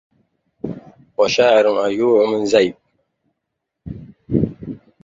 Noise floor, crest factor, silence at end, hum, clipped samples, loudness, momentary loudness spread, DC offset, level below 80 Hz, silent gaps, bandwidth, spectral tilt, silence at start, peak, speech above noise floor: -78 dBFS; 18 dB; 0.25 s; none; under 0.1%; -16 LUFS; 22 LU; under 0.1%; -48 dBFS; none; 7.8 kHz; -5.5 dB/octave; 0.65 s; -2 dBFS; 63 dB